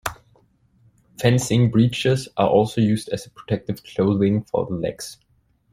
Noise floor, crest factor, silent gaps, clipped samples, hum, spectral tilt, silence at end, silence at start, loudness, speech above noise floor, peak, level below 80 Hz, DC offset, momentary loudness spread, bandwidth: -59 dBFS; 18 dB; none; under 0.1%; none; -6.5 dB/octave; 0.6 s; 0.05 s; -21 LUFS; 39 dB; -2 dBFS; -52 dBFS; under 0.1%; 12 LU; 15.5 kHz